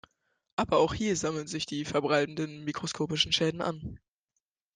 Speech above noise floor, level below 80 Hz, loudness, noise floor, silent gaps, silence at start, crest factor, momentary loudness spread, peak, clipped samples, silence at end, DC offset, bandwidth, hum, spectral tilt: 54 dB; -58 dBFS; -30 LUFS; -84 dBFS; none; 0.6 s; 20 dB; 9 LU; -10 dBFS; under 0.1%; 0.8 s; under 0.1%; 10 kHz; none; -4 dB/octave